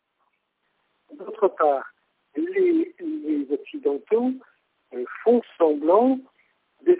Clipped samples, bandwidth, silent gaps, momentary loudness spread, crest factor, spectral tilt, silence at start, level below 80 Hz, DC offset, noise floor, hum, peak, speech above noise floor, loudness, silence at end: under 0.1%; 4 kHz; none; 17 LU; 18 dB; -9.5 dB/octave; 1.1 s; -76 dBFS; under 0.1%; -73 dBFS; none; -6 dBFS; 51 dB; -23 LUFS; 0 s